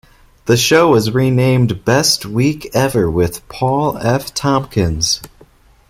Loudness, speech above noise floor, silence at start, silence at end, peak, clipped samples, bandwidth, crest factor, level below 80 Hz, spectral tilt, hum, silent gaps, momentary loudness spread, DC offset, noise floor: -14 LUFS; 33 dB; 0.45 s; 0.6 s; 0 dBFS; under 0.1%; 16 kHz; 14 dB; -38 dBFS; -4.5 dB/octave; none; none; 7 LU; under 0.1%; -47 dBFS